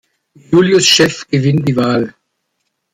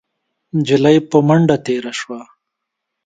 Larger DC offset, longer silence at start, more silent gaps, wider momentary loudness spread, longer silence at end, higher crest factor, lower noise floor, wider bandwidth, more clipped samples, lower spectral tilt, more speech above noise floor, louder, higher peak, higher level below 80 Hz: neither; about the same, 0.5 s vs 0.55 s; neither; second, 8 LU vs 14 LU; about the same, 0.85 s vs 0.8 s; about the same, 14 dB vs 16 dB; second, -70 dBFS vs -78 dBFS; first, 15.5 kHz vs 9.2 kHz; neither; second, -4.5 dB/octave vs -6.5 dB/octave; second, 58 dB vs 64 dB; first, -12 LUFS vs -15 LUFS; about the same, 0 dBFS vs 0 dBFS; about the same, -52 dBFS vs -56 dBFS